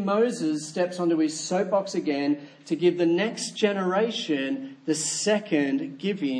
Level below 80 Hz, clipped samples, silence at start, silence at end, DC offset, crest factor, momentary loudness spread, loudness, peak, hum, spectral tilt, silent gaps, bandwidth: -80 dBFS; under 0.1%; 0 s; 0 s; under 0.1%; 18 dB; 5 LU; -26 LUFS; -8 dBFS; none; -4.5 dB/octave; none; 10.5 kHz